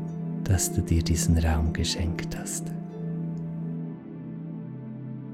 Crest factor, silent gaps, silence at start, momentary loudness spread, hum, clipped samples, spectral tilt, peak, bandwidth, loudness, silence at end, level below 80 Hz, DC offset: 16 dB; none; 0 s; 14 LU; none; under 0.1%; -5 dB/octave; -12 dBFS; 16 kHz; -29 LUFS; 0 s; -38 dBFS; under 0.1%